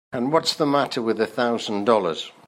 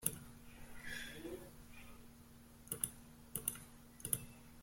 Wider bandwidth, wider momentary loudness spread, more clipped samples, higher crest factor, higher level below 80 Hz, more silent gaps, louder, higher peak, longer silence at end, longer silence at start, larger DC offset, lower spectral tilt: about the same, 16 kHz vs 16.5 kHz; second, 4 LU vs 19 LU; neither; second, 18 dB vs 32 dB; second, -70 dBFS vs -64 dBFS; neither; first, -22 LUFS vs -45 LUFS; first, -4 dBFS vs -16 dBFS; first, 0.2 s vs 0 s; about the same, 0.1 s vs 0 s; neither; first, -4.5 dB/octave vs -2.5 dB/octave